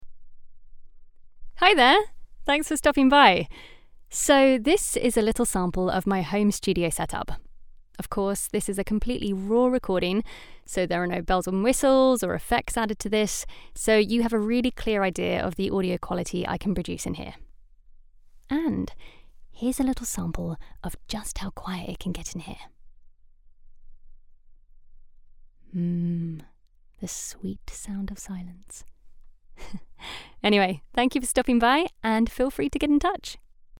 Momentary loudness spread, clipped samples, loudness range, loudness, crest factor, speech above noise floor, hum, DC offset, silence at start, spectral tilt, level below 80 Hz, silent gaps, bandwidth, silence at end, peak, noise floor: 19 LU; under 0.1%; 15 LU; -24 LUFS; 24 dB; 30 dB; none; under 0.1%; 0 s; -4 dB/octave; -42 dBFS; none; 19 kHz; 0 s; -2 dBFS; -55 dBFS